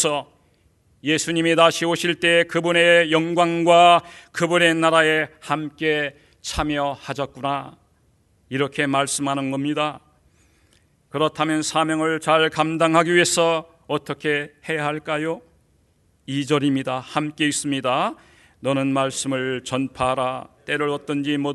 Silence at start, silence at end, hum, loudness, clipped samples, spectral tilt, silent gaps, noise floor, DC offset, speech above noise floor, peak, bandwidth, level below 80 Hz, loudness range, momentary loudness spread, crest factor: 0 s; 0 s; none; -20 LUFS; under 0.1%; -4 dB/octave; none; -61 dBFS; under 0.1%; 41 dB; 0 dBFS; 12 kHz; -52 dBFS; 9 LU; 12 LU; 20 dB